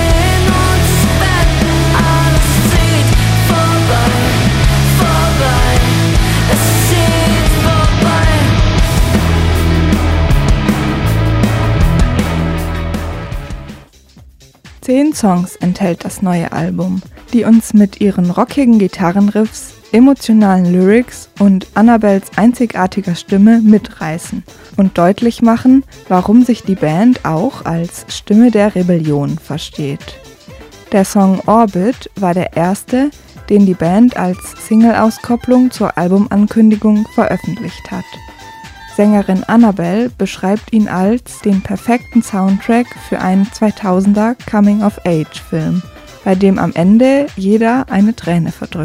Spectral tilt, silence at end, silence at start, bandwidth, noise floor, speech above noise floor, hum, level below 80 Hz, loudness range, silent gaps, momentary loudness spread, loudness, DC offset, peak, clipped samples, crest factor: -6 dB/octave; 0 s; 0 s; 16.5 kHz; -41 dBFS; 29 dB; none; -22 dBFS; 4 LU; none; 10 LU; -12 LUFS; under 0.1%; 0 dBFS; 0.2%; 12 dB